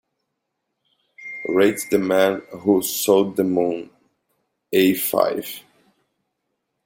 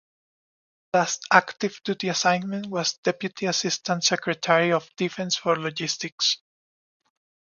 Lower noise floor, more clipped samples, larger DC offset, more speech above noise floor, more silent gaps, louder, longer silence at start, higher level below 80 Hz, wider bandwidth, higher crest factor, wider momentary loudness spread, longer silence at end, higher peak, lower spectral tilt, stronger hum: second, -77 dBFS vs under -90 dBFS; neither; neither; second, 58 dB vs over 66 dB; second, none vs 2.98-3.03 s, 6.12-6.18 s; first, -20 LUFS vs -24 LUFS; first, 1.2 s vs 0.95 s; first, -64 dBFS vs -74 dBFS; first, 17 kHz vs 10 kHz; second, 20 dB vs 26 dB; first, 14 LU vs 8 LU; about the same, 1.25 s vs 1.15 s; second, -4 dBFS vs 0 dBFS; first, -4.5 dB/octave vs -3 dB/octave; neither